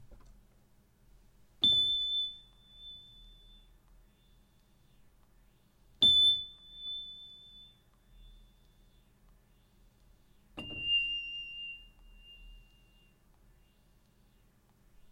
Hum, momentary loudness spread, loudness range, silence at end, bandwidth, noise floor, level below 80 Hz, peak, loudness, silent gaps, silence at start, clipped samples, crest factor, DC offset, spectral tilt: none; 28 LU; 18 LU; 2.55 s; 15.5 kHz; -66 dBFS; -62 dBFS; -16 dBFS; -28 LUFS; none; 0 s; under 0.1%; 22 dB; under 0.1%; -1.5 dB/octave